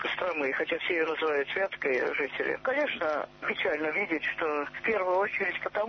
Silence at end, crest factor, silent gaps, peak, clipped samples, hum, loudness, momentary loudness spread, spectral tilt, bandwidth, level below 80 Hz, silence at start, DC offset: 0 s; 12 dB; none; -18 dBFS; under 0.1%; none; -29 LUFS; 3 LU; -5 dB/octave; 6.6 kHz; -66 dBFS; 0 s; under 0.1%